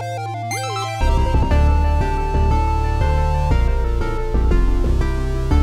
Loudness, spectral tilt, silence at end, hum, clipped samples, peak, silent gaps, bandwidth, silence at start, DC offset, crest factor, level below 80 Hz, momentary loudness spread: -20 LUFS; -6.5 dB/octave; 0 s; none; under 0.1%; -4 dBFS; none; 12.5 kHz; 0 s; under 0.1%; 12 dB; -18 dBFS; 6 LU